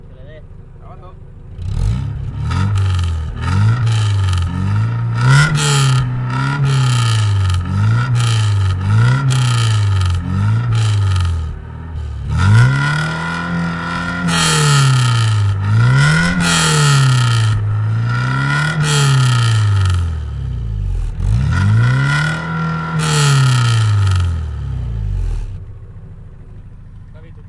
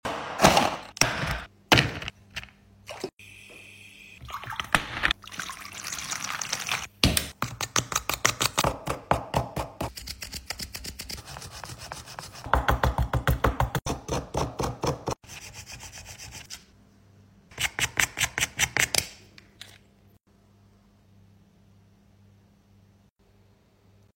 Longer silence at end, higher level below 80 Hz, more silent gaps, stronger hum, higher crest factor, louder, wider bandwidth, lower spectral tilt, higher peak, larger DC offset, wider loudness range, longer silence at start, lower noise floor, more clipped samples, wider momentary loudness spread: second, 0 s vs 4.4 s; first, -28 dBFS vs -40 dBFS; second, none vs 3.13-3.17 s; neither; second, 14 dB vs 30 dB; first, -15 LUFS vs -27 LUFS; second, 11.5 kHz vs 16.5 kHz; first, -5 dB/octave vs -3 dB/octave; about the same, 0 dBFS vs 0 dBFS; neither; second, 4 LU vs 7 LU; about the same, 0 s vs 0.05 s; second, -34 dBFS vs -61 dBFS; neither; second, 12 LU vs 18 LU